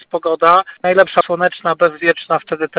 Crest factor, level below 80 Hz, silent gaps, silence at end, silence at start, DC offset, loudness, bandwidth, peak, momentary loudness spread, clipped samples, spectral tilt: 14 dB; -60 dBFS; none; 0 s; 0.15 s; under 0.1%; -14 LUFS; 4 kHz; 0 dBFS; 6 LU; under 0.1%; -8.5 dB/octave